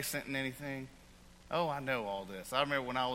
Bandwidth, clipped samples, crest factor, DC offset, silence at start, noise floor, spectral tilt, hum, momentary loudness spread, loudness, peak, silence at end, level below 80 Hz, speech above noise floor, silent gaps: 16.5 kHz; under 0.1%; 22 dB; under 0.1%; 0 s; -58 dBFS; -4 dB/octave; none; 10 LU; -37 LUFS; -16 dBFS; 0 s; -62 dBFS; 22 dB; none